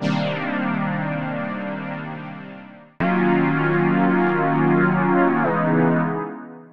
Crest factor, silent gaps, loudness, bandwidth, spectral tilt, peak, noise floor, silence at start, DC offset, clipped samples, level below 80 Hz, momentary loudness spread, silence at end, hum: 16 dB; none; -20 LUFS; 6.6 kHz; -9 dB/octave; -6 dBFS; -41 dBFS; 0 s; 0.7%; under 0.1%; -58 dBFS; 14 LU; 0 s; none